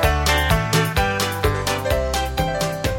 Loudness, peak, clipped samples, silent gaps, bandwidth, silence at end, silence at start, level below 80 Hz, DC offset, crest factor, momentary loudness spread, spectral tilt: -20 LUFS; -2 dBFS; under 0.1%; none; 17 kHz; 0 s; 0 s; -26 dBFS; under 0.1%; 18 dB; 5 LU; -4 dB/octave